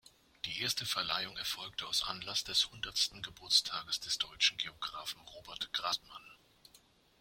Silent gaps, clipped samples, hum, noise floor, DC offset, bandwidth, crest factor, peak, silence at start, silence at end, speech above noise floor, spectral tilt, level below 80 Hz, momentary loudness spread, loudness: none; under 0.1%; none; -66 dBFS; under 0.1%; 16.5 kHz; 24 dB; -14 dBFS; 0.45 s; 0.85 s; 29 dB; 0 dB/octave; -66 dBFS; 14 LU; -34 LUFS